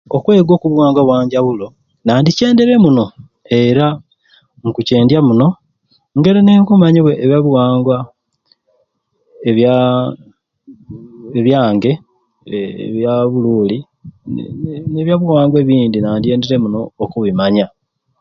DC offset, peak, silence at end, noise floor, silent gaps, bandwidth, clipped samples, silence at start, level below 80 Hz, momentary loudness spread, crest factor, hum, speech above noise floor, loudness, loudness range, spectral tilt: under 0.1%; 0 dBFS; 0.55 s; -62 dBFS; none; 7 kHz; under 0.1%; 0.1 s; -48 dBFS; 14 LU; 12 dB; none; 51 dB; -13 LUFS; 6 LU; -8 dB/octave